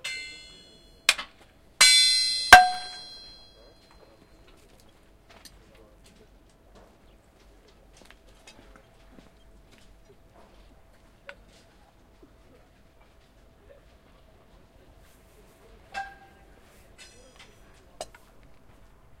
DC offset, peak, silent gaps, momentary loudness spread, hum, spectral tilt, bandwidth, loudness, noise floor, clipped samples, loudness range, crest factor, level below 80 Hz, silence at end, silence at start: under 0.1%; 0 dBFS; none; 30 LU; none; 0.5 dB/octave; 16 kHz; -18 LUFS; -57 dBFS; under 0.1%; 27 LU; 30 dB; -54 dBFS; 1.15 s; 0.05 s